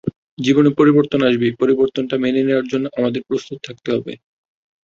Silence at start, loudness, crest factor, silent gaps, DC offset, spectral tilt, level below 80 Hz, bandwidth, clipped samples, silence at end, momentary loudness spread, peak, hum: 0.05 s; -17 LUFS; 16 dB; 0.16-0.37 s; under 0.1%; -7 dB/octave; -56 dBFS; 7.4 kHz; under 0.1%; 0.7 s; 11 LU; -2 dBFS; none